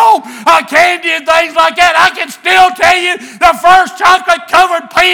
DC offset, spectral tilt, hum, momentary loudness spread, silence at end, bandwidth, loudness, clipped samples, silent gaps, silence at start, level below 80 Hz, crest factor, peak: under 0.1%; -1 dB/octave; none; 4 LU; 0 s; over 20 kHz; -8 LUFS; 3%; none; 0 s; -42 dBFS; 8 dB; 0 dBFS